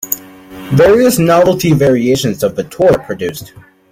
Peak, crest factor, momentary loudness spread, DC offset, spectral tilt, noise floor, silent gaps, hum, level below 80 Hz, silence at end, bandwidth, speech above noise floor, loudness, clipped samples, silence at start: 0 dBFS; 12 dB; 12 LU; under 0.1%; -5.5 dB/octave; -32 dBFS; none; none; -42 dBFS; 0.45 s; 16.5 kHz; 21 dB; -12 LUFS; under 0.1%; 0 s